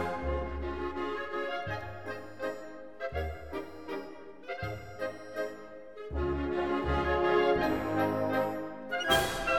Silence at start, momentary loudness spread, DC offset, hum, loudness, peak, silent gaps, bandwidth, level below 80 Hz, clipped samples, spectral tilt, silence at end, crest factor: 0 s; 14 LU; 0.3%; none; -33 LUFS; -12 dBFS; none; 17.5 kHz; -44 dBFS; under 0.1%; -5 dB/octave; 0 s; 20 dB